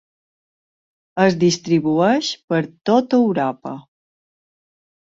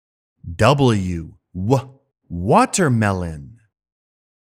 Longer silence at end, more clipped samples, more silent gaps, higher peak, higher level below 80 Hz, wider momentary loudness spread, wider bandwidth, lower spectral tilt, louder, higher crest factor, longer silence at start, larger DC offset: first, 1.25 s vs 1 s; neither; first, 2.44-2.48 s vs none; about the same, -2 dBFS vs 0 dBFS; second, -62 dBFS vs -44 dBFS; second, 15 LU vs 19 LU; second, 7.8 kHz vs 15 kHz; about the same, -5.5 dB/octave vs -5.5 dB/octave; about the same, -18 LUFS vs -18 LUFS; about the same, 18 dB vs 20 dB; first, 1.15 s vs 0.45 s; neither